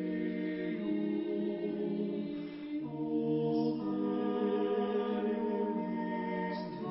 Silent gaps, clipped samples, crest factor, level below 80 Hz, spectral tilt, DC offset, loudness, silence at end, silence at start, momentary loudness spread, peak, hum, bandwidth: none; under 0.1%; 12 dB; -72 dBFS; -6.5 dB/octave; under 0.1%; -35 LUFS; 0 s; 0 s; 6 LU; -22 dBFS; none; 5.6 kHz